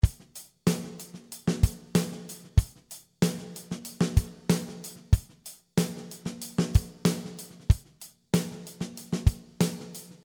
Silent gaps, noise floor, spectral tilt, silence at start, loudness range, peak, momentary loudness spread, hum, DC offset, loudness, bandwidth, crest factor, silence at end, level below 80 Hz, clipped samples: none; -52 dBFS; -6 dB/octave; 0.05 s; 1 LU; -6 dBFS; 15 LU; none; under 0.1%; -30 LUFS; over 20 kHz; 22 dB; 0.15 s; -34 dBFS; under 0.1%